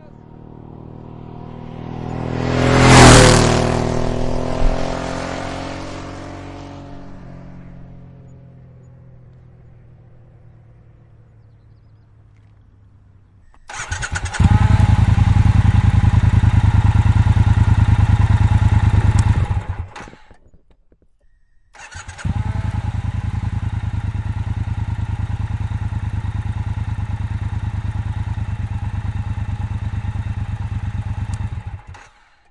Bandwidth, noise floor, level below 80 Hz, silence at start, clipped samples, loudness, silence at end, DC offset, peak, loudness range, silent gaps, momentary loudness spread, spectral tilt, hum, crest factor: 11.5 kHz; -54 dBFS; -26 dBFS; 0.35 s; under 0.1%; -17 LUFS; 0.5 s; under 0.1%; 0 dBFS; 16 LU; none; 21 LU; -5.5 dB/octave; none; 18 dB